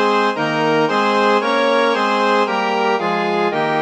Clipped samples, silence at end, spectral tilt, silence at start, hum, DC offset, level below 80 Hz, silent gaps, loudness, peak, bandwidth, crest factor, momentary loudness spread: under 0.1%; 0 s; -5 dB/octave; 0 s; none; 0.1%; -72 dBFS; none; -16 LUFS; -2 dBFS; 10.5 kHz; 14 dB; 3 LU